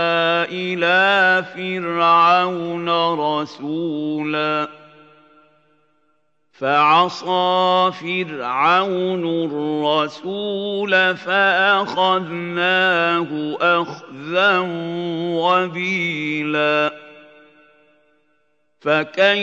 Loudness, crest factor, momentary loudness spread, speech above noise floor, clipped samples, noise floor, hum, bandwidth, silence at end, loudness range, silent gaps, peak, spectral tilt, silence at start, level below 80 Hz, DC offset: -18 LUFS; 18 dB; 10 LU; 49 dB; under 0.1%; -67 dBFS; none; 8 kHz; 0 s; 6 LU; none; -2 dBFS; -5.5 dB/octave; 0 s; -76 dBFS; under 0.1%